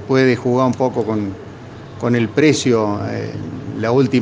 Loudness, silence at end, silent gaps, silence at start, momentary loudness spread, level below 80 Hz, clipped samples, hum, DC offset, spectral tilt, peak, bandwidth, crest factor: -17 LUFS; 0 s; none; 0 s; 15 LU; -54 dBFS; under 0.1%; none; under 0.1%; -6 dB/octave; 0 dBFS; 9.8 kHz; 18 dB